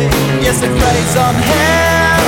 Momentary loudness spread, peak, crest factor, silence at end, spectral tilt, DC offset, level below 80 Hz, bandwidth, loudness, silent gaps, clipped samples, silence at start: 3 LU; 0 dBFS; 10 dB; 0 s; -4.5 dB/octave; under 0.1%; -24 dBFS; 19.5 kHz; -11 LUFS; none; under 0.1%; 0 s